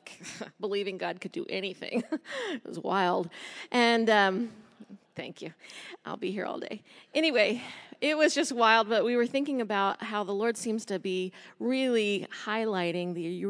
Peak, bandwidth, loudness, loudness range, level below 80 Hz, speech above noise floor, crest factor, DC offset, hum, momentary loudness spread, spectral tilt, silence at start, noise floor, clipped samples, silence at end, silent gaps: -8 dBFS; 11 kHz; -29 LUFS; 6 LU; -86 dBFS; 23 dB; 22 dB; under 0.1%; none; 18 LU; -4 dB/octave; 0.05 s; -52 dBFS; under 0.1%; 0 s; none